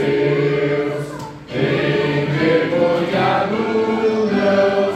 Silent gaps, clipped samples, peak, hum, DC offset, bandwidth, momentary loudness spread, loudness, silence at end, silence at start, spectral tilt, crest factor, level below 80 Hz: none; under 0.1%; -4 dBFS; none; under 0.1%; 11 kHz; 7 LU; -17 LUFS; 0 s; 0 s; -7 dB/octave; 14 dB; -52 dBFS